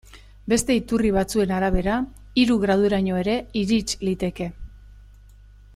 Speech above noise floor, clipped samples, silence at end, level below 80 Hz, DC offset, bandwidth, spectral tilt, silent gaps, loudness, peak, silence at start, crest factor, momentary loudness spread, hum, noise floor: 26 dB; under 0.1%; 0.75 s; -38 dBFS; under 0.1%; 15 kHz; -5 dB/octave; none; -22 LUFS; -6 dBFS; 0.15 s; 18 dB; 7 LU; 50 Hz at -40 dBFS; -47 dBFS